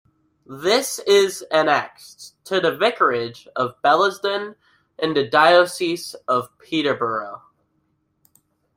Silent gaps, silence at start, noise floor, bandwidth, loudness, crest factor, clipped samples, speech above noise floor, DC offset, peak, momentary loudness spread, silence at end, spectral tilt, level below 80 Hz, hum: none; 0.5 s; -68 dBFS; 16 kHz; -20 LUFS; 20 dB; under 0.1%; 48 dB; under 0.1%; -2 dBFS; 15 LU; 1.4 s; -3.5 dB/octave; -66 dBFS; none